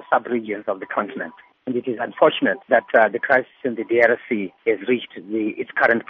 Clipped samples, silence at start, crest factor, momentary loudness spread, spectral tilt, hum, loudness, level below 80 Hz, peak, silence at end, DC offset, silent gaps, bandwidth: under 0.1%; 0 s; 20 dB; 11 LU; -2.5 dB/octave; none; -21 LUFS; -68 dBFS; -2 dBFS; 0.1 s; under 0.1%; none; 6.2 kHz